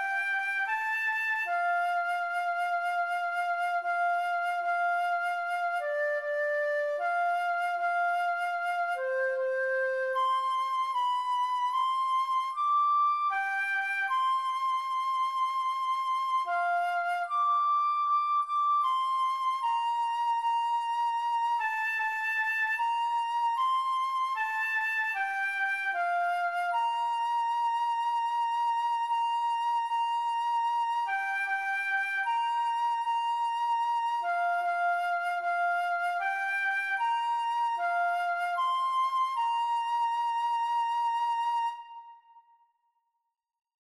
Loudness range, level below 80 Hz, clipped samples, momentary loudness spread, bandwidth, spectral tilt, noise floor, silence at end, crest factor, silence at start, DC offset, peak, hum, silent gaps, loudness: 2 LU; -84 dBFS; under 0.1%; 3 LU; 13.5 kHz; 1.5 dB/octave; -83 dBFS; 1.45 s; 8 dB; 0 s; under 0.1%; -20 dBFS; none; none; -29 LUFS